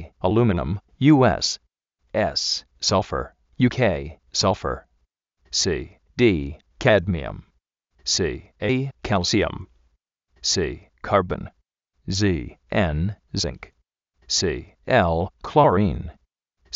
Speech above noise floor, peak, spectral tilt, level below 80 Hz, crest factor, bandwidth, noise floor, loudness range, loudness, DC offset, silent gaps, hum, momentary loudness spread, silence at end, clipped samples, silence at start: 48 dB; -2 dBFS; -4.5 dB/octave; -40 dBFS; 22 dB; 8 kHz; -69 dBFS; 4 LU; -22 LUFS; under 0.1%; none; none; 14 LU; 0 s; under 0.1%; 0 s